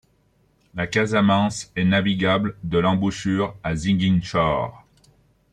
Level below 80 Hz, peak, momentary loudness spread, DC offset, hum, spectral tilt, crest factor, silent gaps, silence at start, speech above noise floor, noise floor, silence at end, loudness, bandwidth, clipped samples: -48 dBFS; -6 dBFS; 7 LU; under 0.1%; none; -6 dB/octave; 16 dB; none; 0.75 s; 41 dB; -62 dBFS; 0.75 s; -21 LUFS; 9.6 kHz; under 0.1%